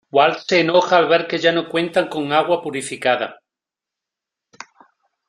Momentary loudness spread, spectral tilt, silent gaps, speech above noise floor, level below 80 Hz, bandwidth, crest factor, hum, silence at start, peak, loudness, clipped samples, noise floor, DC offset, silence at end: 7 LU; -4 dB/octave; none; 69 dB; -66 dBFS; 12 kHz; 18 dB; none; 0.15 s; -2 dBFS; -18 LUFS; under 0.1%; -87 dBFS; under 0.1%; 1.95 s